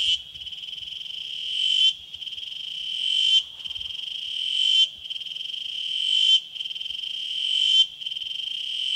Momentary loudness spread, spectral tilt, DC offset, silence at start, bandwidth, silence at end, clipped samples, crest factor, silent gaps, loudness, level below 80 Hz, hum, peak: 14 LU; 3 dB/octave; under 0.1%; 0 s; 16 kHz; 0 s; under 0.1%; 18 dB; none; -23 LUFS; -66 dBFS; none; -8 dBFS